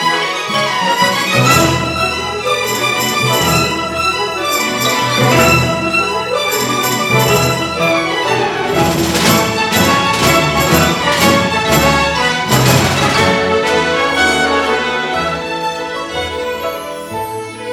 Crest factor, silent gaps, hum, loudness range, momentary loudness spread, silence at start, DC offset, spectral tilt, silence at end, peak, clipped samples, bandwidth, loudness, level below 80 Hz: 14 dB; none; none; 3 LU; 8 LU; 0 s; under 0.1%; -3.5 dB/octave; 0 s; 0 dBFS; under 0.1%; 18 kHz; -13 LUFS; -36 dBFS